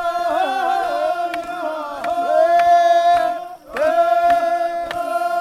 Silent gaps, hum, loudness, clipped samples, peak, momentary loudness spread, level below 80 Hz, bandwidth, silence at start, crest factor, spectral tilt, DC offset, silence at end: none; none; -18 LUFS; under 0.1%; -4 dBFS; 12 LU; -56 dBFS; 14 kHz; 0 s; 12 dB; -3 dB/octave; under 0.1%; 0 s